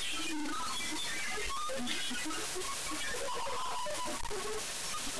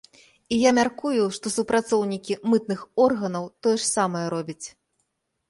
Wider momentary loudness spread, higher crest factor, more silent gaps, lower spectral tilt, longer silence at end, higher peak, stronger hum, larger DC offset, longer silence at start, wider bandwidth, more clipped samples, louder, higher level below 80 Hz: second, 2 LU vs 9 LU; about the same, 16 dB vs 18 dB; neither; second, -1 dB/octave vs -4 dB/octave; second, 0 s vs 0.8 s; second, -20 dBFS vs -6 dBFS; neither; first, 1% vs under 0.1%; second, 0 s vs 0.5 s; first, 14 kHz vs 11.5 kHz; neither; second, -36 LUFS vs -24 LUFS; first, -54 dBFS vs -62 dBFS